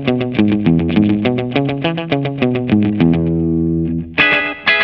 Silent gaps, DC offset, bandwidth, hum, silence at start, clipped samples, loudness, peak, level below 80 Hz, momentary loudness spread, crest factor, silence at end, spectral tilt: none; under 0.1%; 5.8 kHz; none; 0 s; under 0.1%; -15 LUFS; 0 dBFS; -38 dBFS; 6 LU; 14 dB; 0 s; -9 dB/octave